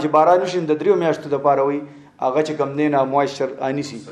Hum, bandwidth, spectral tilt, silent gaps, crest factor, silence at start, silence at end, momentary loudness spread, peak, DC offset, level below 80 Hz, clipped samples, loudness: none; 10.5 kHz; -6 dB/octave; none; 16 dB; 0 s; 0 s; 9 LU; -2 dBFS; under 0.1%; -68 dBFS; under 0.1%; -19 LUFS